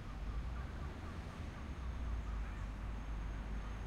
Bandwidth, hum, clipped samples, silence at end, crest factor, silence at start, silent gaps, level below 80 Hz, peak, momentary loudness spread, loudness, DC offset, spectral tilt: 10 kHz; none; under 0.1%; 0 s; 12 dB; 0 s; none; -44 dBFS; -32 dBFS; 4 LU; -46 LUFS; under 0.1%; -6.5 dB/octave